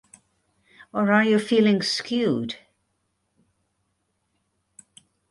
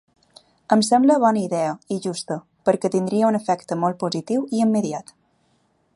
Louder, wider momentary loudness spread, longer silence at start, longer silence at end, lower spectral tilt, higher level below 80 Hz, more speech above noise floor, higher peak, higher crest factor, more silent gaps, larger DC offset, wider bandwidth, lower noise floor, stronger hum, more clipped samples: about the same, -22 LUFS vs -21 LUFS; first, 14 LU vs 11 LU; first, 0.95 s vs 0.7 s; first, 2.75 s vs 0.95 s; about the same, -5 dB/octave vs -5.5 dB/octave; about the same, -68 dBFS vs -70 dBFS; first, 53 dB vs 44 dB; second, -6 dBFS vs -2 dBFS; about the same, 20 dB vs 20 dB; neither; neither; about the same, 11.5 kHz vs 11.5 kHz; first, -74 dBFS vs -65 dBFS; neither; neither